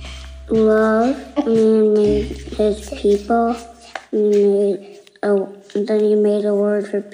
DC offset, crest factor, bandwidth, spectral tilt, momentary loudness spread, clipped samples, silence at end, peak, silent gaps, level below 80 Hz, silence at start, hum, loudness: under 0.1%; 12 dB; 11 kHz; -7 dB/octave; 12 LU; under 0.1%; 0.05 s; -6 dBFS; none; -40 dBFS; 0 s; none; -17 LUFS